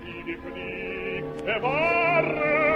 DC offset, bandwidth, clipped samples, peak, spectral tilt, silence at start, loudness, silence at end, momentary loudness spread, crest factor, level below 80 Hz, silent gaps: under 0.1%; 10.5 kHz; under 0.1%; -10 dBFS; -6.5 dB/octave; 0 s; -25 LUFS; 0 s; 13 LU; 16 dB; -52 dBFS; none